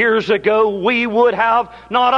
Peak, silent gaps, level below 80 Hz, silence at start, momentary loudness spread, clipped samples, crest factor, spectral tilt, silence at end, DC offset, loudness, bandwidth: -2 dBFS; none; -52 dBFS; 0 s; 3 LU; under 0.1%; 12 dB; -5.5 dB/octave; 0 s; under 0.1%; -15 LUFS; 7.2 kHz